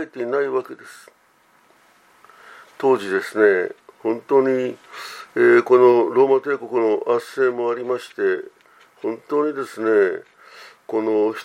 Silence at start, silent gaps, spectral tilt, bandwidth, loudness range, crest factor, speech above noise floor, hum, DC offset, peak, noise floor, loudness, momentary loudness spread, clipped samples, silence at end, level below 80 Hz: 0 s; none; -6 dB/octave; 13 kHz; 6 LU; 18 dB; 38 dB; none; under 0.1%; -2 dBFS; -57 dBFS; -20 LUFS; 15 LU; under 0.1%; 0 s; -78 dBFS